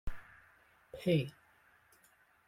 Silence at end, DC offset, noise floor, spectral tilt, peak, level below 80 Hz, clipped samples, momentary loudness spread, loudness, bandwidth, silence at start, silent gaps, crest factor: 1.15 s; under 0.1%; -68 dBFS; -7.5 dB/octave; -18 dBFS; -52 dBFS; under 0.1%; 23 LU; -35 LUFS; 16 kHz; 0.05 s; none; 22 dB